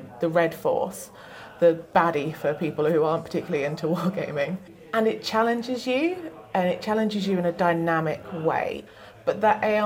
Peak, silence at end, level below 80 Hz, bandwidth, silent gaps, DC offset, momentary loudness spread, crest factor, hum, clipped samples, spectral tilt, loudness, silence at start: -6 dBFS; 0 s; -64 dBFS; 17 kHz; none; under 0.1%; 9 LU; 20 dB; none; under 0.1%; -6 dB/octave; -25 LUFS; 0 s